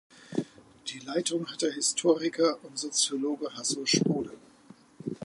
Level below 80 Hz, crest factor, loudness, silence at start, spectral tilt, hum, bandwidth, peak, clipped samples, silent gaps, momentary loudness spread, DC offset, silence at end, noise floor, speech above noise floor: -72 dBFS; 20 dB; -29 LUFS; 0.15 s; -3 dB/octave; none; 11.5 kHz; -10 dBFS; under 0.1%; none; 14 LU; under 0.1%; 0 s; -56 dBFS; 27 dB